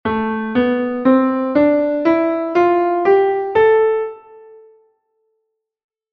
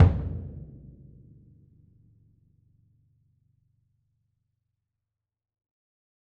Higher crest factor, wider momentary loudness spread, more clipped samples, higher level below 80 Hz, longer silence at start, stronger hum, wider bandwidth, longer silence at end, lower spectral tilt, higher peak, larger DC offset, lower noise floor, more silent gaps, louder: second, 14 dB vs 26 dB; second, 6 LU vs 26 LU; neither; second, -54 dBFS vs -42 dBFS; about the same, 0.05 s vs 0 s; neither; first, 6.2 kHz vs 3.8 kHz; second, 1.95 s vs 5.65 s; second, -8 dB/octave vs -10 dB/octave; about the same, -2 dBFS vs -4 dBFS; neither; second, -73 dBFS vs -87 dBFS; neither; first, -15 LUFS vs -29 LUFS